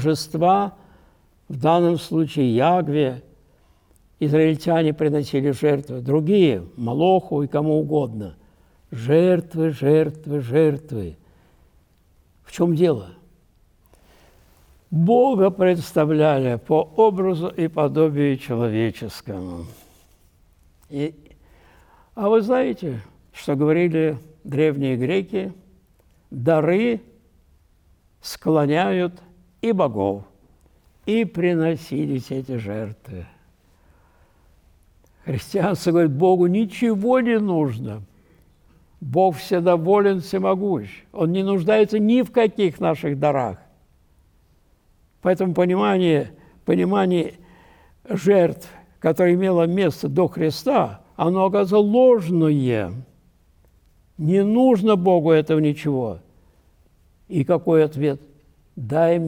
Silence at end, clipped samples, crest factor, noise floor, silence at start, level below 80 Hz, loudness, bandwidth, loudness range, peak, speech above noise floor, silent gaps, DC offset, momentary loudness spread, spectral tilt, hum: 0 s; under 0.1%; 14 dB; -58 dBFS; 0 s; -56 dBFS; -20 LUFS; 18.5 kHz; 6 LU; -6 dBFS; 39 dB; none; under 0.1%; 14 LU; -7.5 dB/octave; none